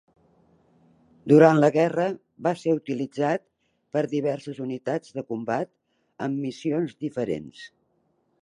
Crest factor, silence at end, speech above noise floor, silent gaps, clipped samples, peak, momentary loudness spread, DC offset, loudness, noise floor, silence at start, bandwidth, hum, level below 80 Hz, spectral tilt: 22 dB; 0.75 s; 46 dB; none; under 0.1%; -4 dBFS; 16 LU; under 0.1%; -25 LUFS; -69 dBFS; 1.25 s; 10.5 kHz; none; -70 dBFS; -7.5 dB/octave